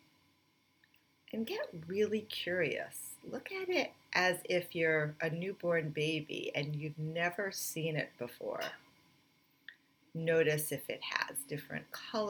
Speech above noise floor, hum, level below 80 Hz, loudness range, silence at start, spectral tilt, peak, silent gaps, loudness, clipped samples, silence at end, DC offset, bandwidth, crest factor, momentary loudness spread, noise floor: 37 dB; none; -82 dBFS; 5 LU; 1.3 s; -4 dB/octave; -14 dBFS; none; -36 LUFS; under 0.1%; 0 s; under 0.1%; over 20 kHz; 24 dB; 12 LU; -73 dBFS